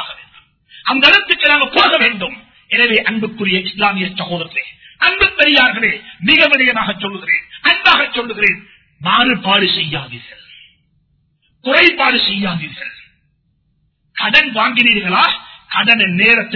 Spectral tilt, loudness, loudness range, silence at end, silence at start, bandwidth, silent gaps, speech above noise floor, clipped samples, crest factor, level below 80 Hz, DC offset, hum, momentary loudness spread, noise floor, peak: -5 dB/octave; -12 LUFS; 4 LU; 0 s; 0 s; 6 kHz; none; 48 dB; 0.1%; 16 dB; -48 dBFS; under 0.1%; none; 14 LU; -61 dBFS; 0 dBFS